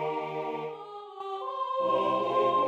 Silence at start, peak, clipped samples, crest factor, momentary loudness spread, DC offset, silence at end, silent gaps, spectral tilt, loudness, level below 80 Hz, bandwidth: 0 s; -14 dBFS; under 0.1%; 16 dB; 14 LU; under 0.1%; 0 s; none; -6.5 dB/octave; -30 LUFS; -80 dBFS; 8.2 kHz